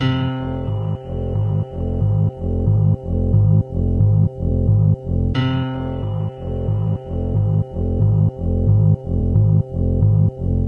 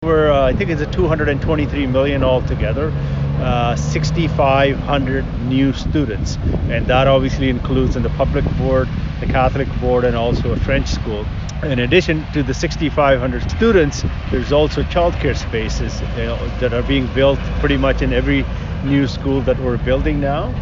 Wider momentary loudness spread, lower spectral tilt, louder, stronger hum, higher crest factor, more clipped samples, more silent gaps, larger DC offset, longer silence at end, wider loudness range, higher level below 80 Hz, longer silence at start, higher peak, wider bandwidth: about the same, 8 LU vs 7 LU; first, -10.5 dB/octave vs -6.5 dB/octave; about the same, -19 LUFS vs -17 LUFS; neither; about the same, 12 dB vs 16 dB; neither; neither; neither; about the same, 0 s vs 0 s; about the same, 3 LU vs 1 LU; about the same, -28 dBFS vs -24 dBFS; about the same, 0 s vs 0 s; second, -6 dBFS vs -2 dBFS; second, 4.3 kHz vs 7.6 kHz